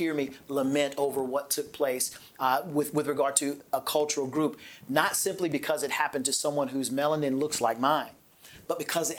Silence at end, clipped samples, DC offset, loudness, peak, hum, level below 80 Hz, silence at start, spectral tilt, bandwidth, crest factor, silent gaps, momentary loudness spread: 0 s; under 0.1%; under 0.1%; -28 LUFS; -6 dBFS; none; -72 dBFS; 0 s; -3 dB/octave; over 20 kHz; 22 dB; none; 6 LU